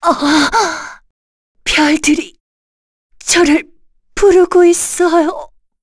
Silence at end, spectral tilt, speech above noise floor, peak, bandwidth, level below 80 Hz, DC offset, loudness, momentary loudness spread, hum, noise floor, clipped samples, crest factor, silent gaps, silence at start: 0.35 s; -2 dB/octave; over 79 dB; 0 dBFS; 11 kHz; -38 dBFS; under 0.1%; -12 LUFS; 16 LU; none; under -90 dBFS; under 0.1%; 14 dB; 1.10-1.55 s, 2.40-3.10 s; 0 s